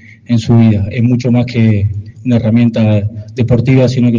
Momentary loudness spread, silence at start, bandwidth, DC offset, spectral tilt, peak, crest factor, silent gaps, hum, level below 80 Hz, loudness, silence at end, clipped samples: 8 LU; 0.3 s; 7.4 kHz; under 0.1%; -8.5 dB/octave; 0 dBFS; 10 dB; none; none; -40 dBFS; -12 LUFS; 0 s; under 0.1%